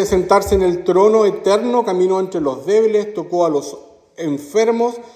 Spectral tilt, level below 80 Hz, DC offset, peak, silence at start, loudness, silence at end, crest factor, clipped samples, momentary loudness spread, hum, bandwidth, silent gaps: -5.5 dB/octave; -40 dBFS; under 0.1%; 0 dBFS; 0 s; -16 LUFS; 0.1 s; 16 dB; under 0.1%; 9 LU; none; 15.5 kHz; none